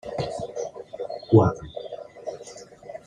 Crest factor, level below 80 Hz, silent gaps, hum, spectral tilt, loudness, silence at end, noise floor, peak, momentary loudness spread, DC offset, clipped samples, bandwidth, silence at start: 22 dB; -54 dBFS; none; none; -8 dB/octave; -25 LUFS; 0.1 s; -44 dBFS; -4 dBFS; 22 LU; under 0.1%; under 0.1%; 10 kHz; 0.05 s